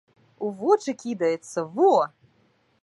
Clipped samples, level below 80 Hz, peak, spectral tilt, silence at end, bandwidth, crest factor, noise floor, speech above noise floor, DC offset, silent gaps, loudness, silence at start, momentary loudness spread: under 0.1%; -80 dBFS; -6 dBFS; -5.5 dB/octave; 0.75 s; 11.5 kHz; 18 dB; -64 dBFS; 42 dB; under 0.1%; none; -24 LUFS; 0.4 s; 12 LU